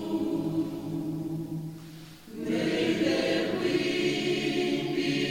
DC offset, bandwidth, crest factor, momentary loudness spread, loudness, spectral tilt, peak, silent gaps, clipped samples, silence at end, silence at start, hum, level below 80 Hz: under 0.1%; 16.5 kHz; 14 dB; 12 LU; -29 LUFS; -5.5 dB/octave; -14 dBFS; none; under 0.1%; 0 s; 0 s; none; -60 dBFS